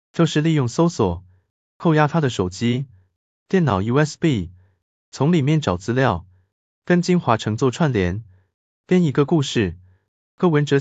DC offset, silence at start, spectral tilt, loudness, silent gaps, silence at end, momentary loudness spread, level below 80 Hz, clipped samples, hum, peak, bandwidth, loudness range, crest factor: under 0.1%; 0.15 s; -6.5 dB/octave; -20 LUFS; 1.50-1.80 s, 3.16-3.46 s, 4.82-5.12 s, 6.52-6.82 s, 8.54-8.84 s, 10.08-10.38 s; 0 s; 8 LU; -44 dBFS; under 0.1%; none; -2 dBFS; 8.2 kHz; 2 LU; 18 dB